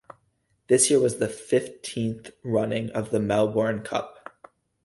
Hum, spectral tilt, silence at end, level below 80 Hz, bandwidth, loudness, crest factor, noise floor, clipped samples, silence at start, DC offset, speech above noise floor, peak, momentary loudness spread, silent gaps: none; -4.5 dB/octave; 0.75 s; -60 dBFS; 12 kHz; -25 LUFS; 18 dB; -70 dBFS; under 0.1%; 0.7 s; under 0.1%; 46 dB; -8 dBFS; 11 LU; none